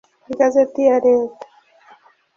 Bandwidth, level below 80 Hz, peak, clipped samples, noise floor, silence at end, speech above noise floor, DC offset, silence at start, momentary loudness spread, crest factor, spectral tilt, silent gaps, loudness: 7.2 kHz; -64 dBFS; -4 dBFS; under 0.1%; -50 dBFS; 1.05 s; 35 dB; under 0.1%; 0.3 s; 12 LU; 16 dB; -5.5 dB/octave; none; -16 LUFS